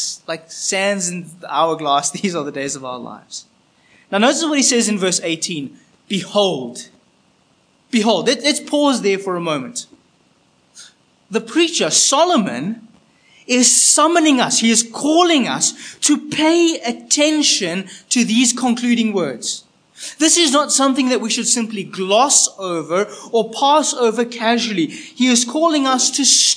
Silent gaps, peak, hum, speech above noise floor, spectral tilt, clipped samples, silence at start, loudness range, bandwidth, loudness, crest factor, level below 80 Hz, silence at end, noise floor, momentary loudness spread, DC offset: none; 0 dBFS; none; 41 dB; -2 dB/octave; under 0.1%; 0 s; 7 LU; 10.5 kHz; -15 LUFS; 18 dB; -74 dBFS; 0 s; -57 dBFS; 13 LU; under 0.1%